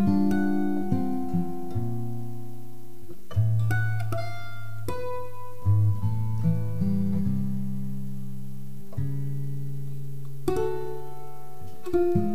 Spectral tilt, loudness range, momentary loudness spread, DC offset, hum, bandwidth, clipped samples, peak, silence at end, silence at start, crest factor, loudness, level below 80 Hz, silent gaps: -8.5 dB/octave; 6 LU; 17 LU; 5%; none; 15.5 kHz; under 0.1%; -10 dBFS; 0 s; 0 s; 16 dB; -29 LUFS; -50 dBFS; none